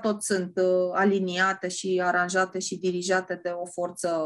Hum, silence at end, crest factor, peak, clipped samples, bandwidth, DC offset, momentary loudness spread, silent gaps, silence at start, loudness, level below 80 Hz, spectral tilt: none; 0 s; 14 dB; -12 dBFS; under 0.1%; 12.5 kHz; under 0.1%; 8 LU; none; 0 s; -26 LUFS; -74 dBFS; -4 dB/octave